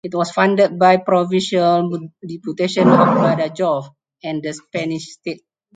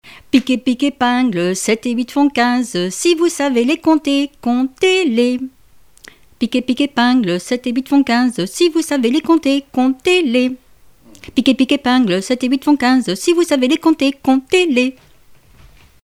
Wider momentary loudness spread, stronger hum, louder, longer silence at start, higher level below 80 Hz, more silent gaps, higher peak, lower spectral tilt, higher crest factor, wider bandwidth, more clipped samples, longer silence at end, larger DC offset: first, 17 LU vs 5 LU; neither; about the same, -17 LUFS vs -15 LUFS; about the same, 0.05 s vs 0.05 s; second, -64 dBFS vs -54 dBFS; neither; about the same, 0 dBFS vs 0 dBFS; first, -6 dB/octave vs -4 dB/octave; about the same, 18 dB vs 16 dB; second, 9.4 kHz vs 15 kHz; neither; second, 0.4 s vs 1.15 s; second, under 0.1% vs 0.3%